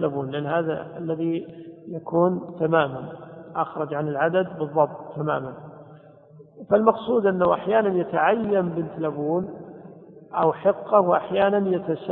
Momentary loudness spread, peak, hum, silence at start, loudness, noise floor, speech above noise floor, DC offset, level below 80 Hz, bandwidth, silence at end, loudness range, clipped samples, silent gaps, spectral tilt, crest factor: 16 LU; -2 dBFS; none; 0 s; -23 LUFS; -49 dBFS; 26 dB; under 0.1%; -62 dBFS; 4.1 kHz; 0 s; 4 LU; under 0.1%; none; -11 dB/octave; 22 dB